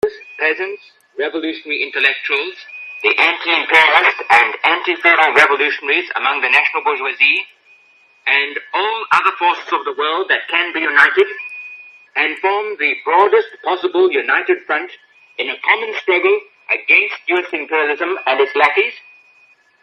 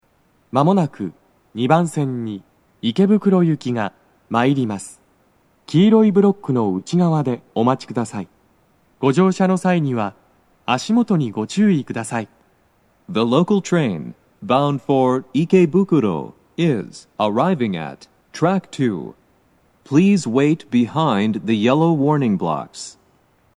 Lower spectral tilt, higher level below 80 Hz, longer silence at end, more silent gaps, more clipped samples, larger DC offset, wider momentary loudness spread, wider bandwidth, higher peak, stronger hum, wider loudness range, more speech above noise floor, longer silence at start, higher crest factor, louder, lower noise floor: second, -2.5 dB/octave vs -7 dB/octave; about the same, -68 dBFS vs -66 dBFS; first, 0.85 s vs 0.65 s; neither; neither; neither; second, 11 LU vs 15 LU; first, 12 kHz vs 10.5 kHz; about the same, 0 dBFS vs -2 dBFS; neither; about the same, 5 LU vs 3 LU; second, 37 dB vs 42 dB; second, 0.05 s vs 0.55 s; about the same, 16 dB vs 18 dB; first, -14 LUFS vs -18 LUFS; second, -52 dBFS vs -60 dBFS